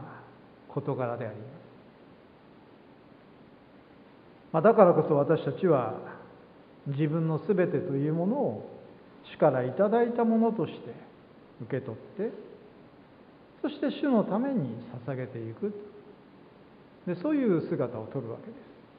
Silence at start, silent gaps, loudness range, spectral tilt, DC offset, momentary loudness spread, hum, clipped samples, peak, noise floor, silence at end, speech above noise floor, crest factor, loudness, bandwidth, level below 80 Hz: 0 s; none; 13 LU; -12 dB/octave; under 0.1%; 21 LU; none; under 0.1%; -4 dBFS; -55 dBFS; 0.25 s; 27 dB; 26 dB; -28 LUFS; 5 kHz; -72 dBFS